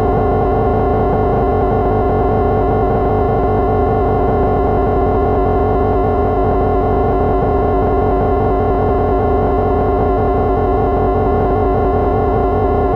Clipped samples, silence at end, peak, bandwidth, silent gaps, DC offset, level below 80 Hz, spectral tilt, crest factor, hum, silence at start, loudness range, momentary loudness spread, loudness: under 0.1%; 0 s; -4 dBFS; 5.4 kHz; none; under 0.1%; -22 dBFS; -10.5 dB/octave; 8 dB; none; 0 s; 0 LU; 0 LU; -14 LUFS